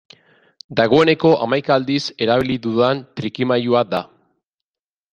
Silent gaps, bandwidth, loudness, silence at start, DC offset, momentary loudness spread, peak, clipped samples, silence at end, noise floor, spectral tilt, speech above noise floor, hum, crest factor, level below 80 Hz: none; 8.8 kHz; -18 LUFS; 0.7 s; under 0.1%; 10 LU; 0 dBFS; under 0.1%; 1.1 s; under -90 dBFS; -6.5 dB/octave; over 73 dB; none; 18 dB; -56 dBFS